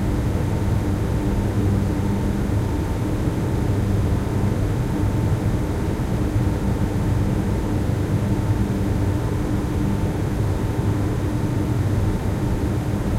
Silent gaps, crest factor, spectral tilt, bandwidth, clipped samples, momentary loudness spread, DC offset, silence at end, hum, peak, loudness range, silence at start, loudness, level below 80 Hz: none; 12 dB; -7.5 dB/octave; 15.5 kHz; under 0.1%; 2 LU; under 0.1%; 0 s; none; -8 dBFS; 1 LU; 0 s; -22 LUFS; -28 dBFS